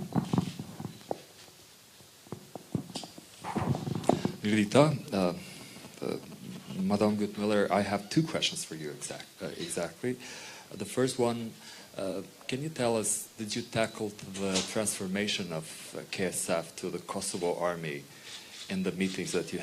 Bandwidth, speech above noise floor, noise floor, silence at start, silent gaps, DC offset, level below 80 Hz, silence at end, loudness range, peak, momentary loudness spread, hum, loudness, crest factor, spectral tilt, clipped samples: 15.5 kHz; 24 dB; -55 dBFS; 0 s; none; under 0.1%; -68 dBFS; 0 s; 5 LU; -8 dBFS; 16 LU; none; -32 LUFS; 26 dB; -4.5 dB/octave; under 0.1%